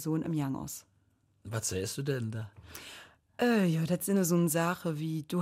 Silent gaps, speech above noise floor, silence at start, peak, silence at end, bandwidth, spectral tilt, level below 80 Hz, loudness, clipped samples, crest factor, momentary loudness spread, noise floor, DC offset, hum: none; 39 dB; 0 s; -18 dBFS; 0 s; 16 kHz; -5.5 dB/octave; -66 dBFS; -31 LUFS; under 0.1%; 14 dB; 18 LU; -70 dBFS; under 0.1%; none